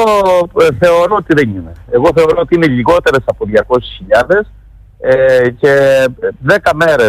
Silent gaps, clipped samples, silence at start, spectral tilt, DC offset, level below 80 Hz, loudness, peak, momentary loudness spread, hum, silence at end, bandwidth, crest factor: none; under 0.1%; 0 s; -6 dB/octave; under 0.1%; -36 dBFS; -10 LUFS; 0 dBFS; 7 LU; none; 0 s; 15 kHz; 10 dB